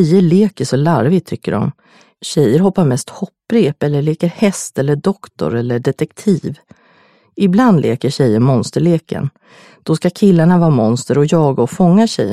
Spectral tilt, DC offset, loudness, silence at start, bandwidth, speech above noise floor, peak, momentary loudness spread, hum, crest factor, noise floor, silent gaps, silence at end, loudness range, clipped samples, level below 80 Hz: -7 dB/octave; under 0.1%; -14 LUFS; 0 s; 13.5 kHz; 38 dB; 0 dBFS; 9 LU; none; 14 dB; -51 dBFS; none; 0 s; 3 LU; under 0.1%; -50 dBFS